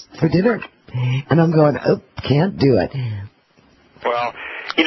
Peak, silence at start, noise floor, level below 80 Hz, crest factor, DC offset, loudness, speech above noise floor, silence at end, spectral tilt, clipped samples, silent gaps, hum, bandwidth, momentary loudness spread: -2 dBFS; 0 s; -54 dBFS; -46 dBFS; 16 dB; under 0.1%; -18 LUFS; 37 dB; 0 s; -8 dB/octave; under 0.1%; none; none; 6 kHz; 11 LU